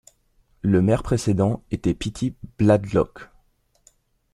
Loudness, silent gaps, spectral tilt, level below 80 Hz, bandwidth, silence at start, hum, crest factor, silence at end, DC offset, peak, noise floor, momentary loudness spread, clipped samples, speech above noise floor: -22 LUFS; none; -7.5 dB/octave; -44 dBFS; 12 kHz; 0.65 s; none; 20 dB; 1.1 s; under 0.1%; -4 dBFS; -63 dBFS; 9 LU; under 0.1%; 42 dB